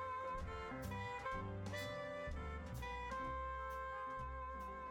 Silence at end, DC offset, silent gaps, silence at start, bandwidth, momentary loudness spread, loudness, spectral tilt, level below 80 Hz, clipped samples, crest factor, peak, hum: 0 s; under 0.1%; none; 0 s; 17 kHz; 3 LU; -46 LUFS; -5.5 dB/octave; -54 dBFS; under 0.1%; 14 dB; -32 dBFS; none